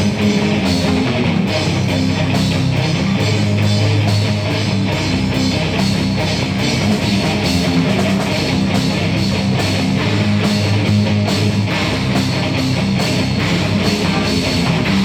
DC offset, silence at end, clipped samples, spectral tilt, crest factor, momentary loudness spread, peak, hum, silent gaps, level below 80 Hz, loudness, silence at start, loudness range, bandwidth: under 0.1%; 0 s; under 0.1%; -5.5 dB/octave; 12 dB; 2 LU; -2 dBFS; none; none; -36 dBFS; -16 LUFS; 0 s; 0 LU; 15.5 kHz